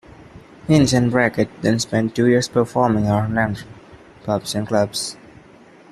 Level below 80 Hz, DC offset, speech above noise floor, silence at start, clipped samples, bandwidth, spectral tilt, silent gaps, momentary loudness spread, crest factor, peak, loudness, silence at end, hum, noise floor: -48 dBFS; under 0.1%; 28 dB; 0.35 s; under 0.1%; 13.5 kHz; -5.5 dB/octave; none; 9 LU; 16 dB; -2 dBFS; -19 LUFS; 0.8 s; none; -46 dBFS